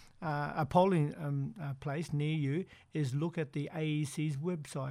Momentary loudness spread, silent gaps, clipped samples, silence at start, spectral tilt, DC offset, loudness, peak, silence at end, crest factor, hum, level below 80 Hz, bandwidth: 9 LU; none; under 0.1%; 0 s; -7 dB/octave; under 0.1%; -35 LUFS; -14 dBFS; 0 s; 20 dB; none; -66 dBFS; 12.5 kHz